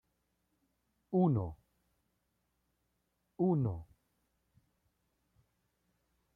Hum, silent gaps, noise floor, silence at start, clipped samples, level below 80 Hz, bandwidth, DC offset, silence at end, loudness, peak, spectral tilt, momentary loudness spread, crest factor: none; none; -81 dBFS; 1.1 s; under 0.1%; -66 dBFS; 3.5 kHz; under 0.1%; 2.55 s; -34 LUFS; -20 dBFS; -12.5 dB/octave; 12 LU; 20 dB